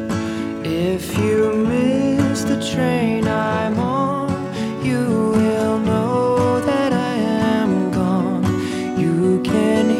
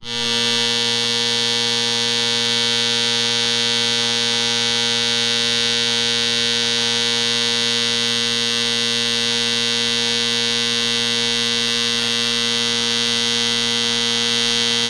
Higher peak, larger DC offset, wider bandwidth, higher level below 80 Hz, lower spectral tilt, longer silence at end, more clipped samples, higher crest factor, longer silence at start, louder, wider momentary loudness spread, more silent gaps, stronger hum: first, -4 dBFS vs -8 dBFS; second, under 0.1% vs 0.2%; about the same, 16 kHz vs 16.5 kHz; first, -46 dBFS vs -56 dBFS; first, -6.5 dB/octave vs -1 dB/octave; about the same, 0 s vs 0 s; neither; about the same, 14 dB vs 12 dB; about the same, 0 s vs 0 s; second, -19 LUFS vs -16 LUFS; first, 5 LU vs 1 LU; neither; neither